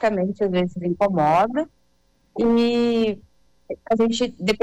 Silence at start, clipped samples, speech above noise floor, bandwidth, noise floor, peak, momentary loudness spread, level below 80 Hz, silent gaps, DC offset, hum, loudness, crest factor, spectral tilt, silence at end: 0 s; under 0.1%; 44 dB; 10 kHz; -64 dBFS; -10 dBFS; 16 LU; -52 dBFS; none; under 0.1%; none; -21 LUFS; 12 dB; -6 dB/octave; 0.05 s